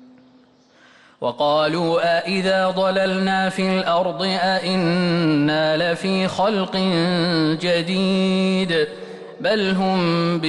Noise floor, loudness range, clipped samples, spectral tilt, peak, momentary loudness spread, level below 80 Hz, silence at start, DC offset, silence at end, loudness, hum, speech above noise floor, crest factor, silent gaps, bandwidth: -53 dBFS; 1 LU; under 0.1%; -6 dB/octave; -10 dBFS; 3 LU; -58 dBFS; 1.2 s; under 0.1%; 0 s; -19 LUFS; none; 34 dB; 10 dB; none; 11.5 kHz